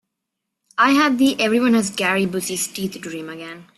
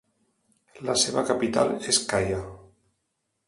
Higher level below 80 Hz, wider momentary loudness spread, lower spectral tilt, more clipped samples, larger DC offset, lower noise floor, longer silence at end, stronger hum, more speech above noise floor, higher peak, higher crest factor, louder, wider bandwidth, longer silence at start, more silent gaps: second, -62 dBFS vs -52 dBFS; first, 16 LU vs 11 LU; about the same, -3.5 dB/octave vs -3 dB/octave; neither; neither; about the same, -80 dBFS vs -78 dBFS; second, 0.15 s vs 0.85 s; neither; first, 61 dB vs 53 dB; first, -4 dBFS vs -8 dBFS; about the same, 16 dB vs 20 dB; first, -18 LUFS vs -24 LUFS; first, 14 kHz vs 11.5 kHz; about the same, 0.75 s vs 0.75 s; neither